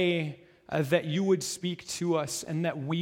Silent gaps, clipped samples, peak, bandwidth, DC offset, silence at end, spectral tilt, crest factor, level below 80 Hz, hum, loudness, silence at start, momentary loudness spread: none; under 0.1%; -12 dBFS; 16.5 kHz; under 0.1%; 0 s; -5 dB/octave; 18 dB; -68 dBFS; none; -30 LUFS; 0 s; 7 LU